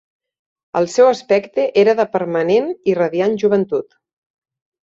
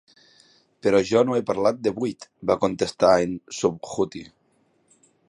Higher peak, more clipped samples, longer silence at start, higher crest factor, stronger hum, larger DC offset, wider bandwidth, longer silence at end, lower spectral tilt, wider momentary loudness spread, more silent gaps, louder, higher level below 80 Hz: about the same, -2 dBFS vs -4 dBFS; neither; about the same, 0.75 s vs 0.85 s; about the same, 16 dB vs 20 dB; neither; neither; second, 8 kHz vs 11 kHz; about the same, 1.1 s vs 1.05 s; about the same, -5.5 dB/octave vs -5.5 dB/octave; second, 7 LU vs 10 LU; neither; first, -16 LUFS vs -23 LUFS; second, -64 dBFS vs -58 dBFS